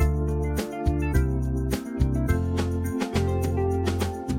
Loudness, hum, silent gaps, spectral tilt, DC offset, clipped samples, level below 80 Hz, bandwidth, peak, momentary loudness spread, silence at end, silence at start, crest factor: -26 LUFS; none; none; -7 dB/octave; under 0.1%; under 0.1%; -30 dBFS; 17 kHz; -8 dBFS; 3 LU; 0 s; 0 s; 16 dB